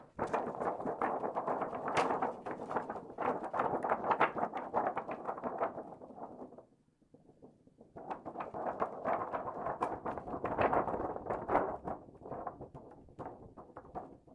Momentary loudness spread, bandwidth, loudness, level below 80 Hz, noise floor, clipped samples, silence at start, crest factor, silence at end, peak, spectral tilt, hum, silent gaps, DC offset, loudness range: 16 LU; 11 kHz; -37 LUFS; -66 dBFS; -70 dBFS; under 0.1%; 0 s; 24 dB; 0 s; -16 dBFS; -6.5 dB/octave; none; none; under 0.1%; 9 LU